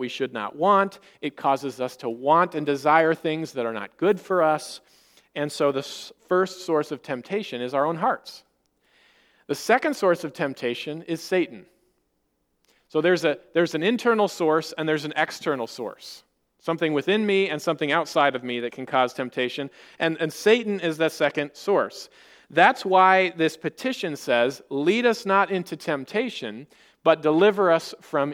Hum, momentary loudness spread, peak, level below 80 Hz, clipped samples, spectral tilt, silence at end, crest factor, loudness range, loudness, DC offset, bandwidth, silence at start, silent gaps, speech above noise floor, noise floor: none; 12 LU; -2 dBFS; -76 dBFS; under 0.1%; -5 dB/octave; 0 s; 22 dB; 5 LU; -23 LUFS; under 0.1%; 17 kHz; 0 s; none; 49 dB; -73 dBFS